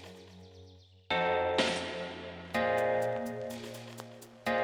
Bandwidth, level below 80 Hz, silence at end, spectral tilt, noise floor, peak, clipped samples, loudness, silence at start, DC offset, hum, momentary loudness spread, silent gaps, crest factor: 19.5 kHz; -64 dBFS; 0 s; -4 dB/octave; -56 dBFS; -16 dBFS; under 0.1%; -33 LUFS; 0 s; under 0.1%; none; 21 LU; none; 18 dB